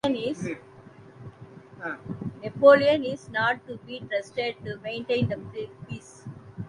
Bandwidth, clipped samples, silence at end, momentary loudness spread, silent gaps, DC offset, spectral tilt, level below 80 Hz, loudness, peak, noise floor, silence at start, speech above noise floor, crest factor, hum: 10.5 kHz; under 0.1%; 0 s; 24 LU; none; under 0.1%; -6 dB/octave; -60 dBFS; -25 LUFS; -4 dBFS; -49 dBFS; 0.05 s; 24 dB; 24 dB; none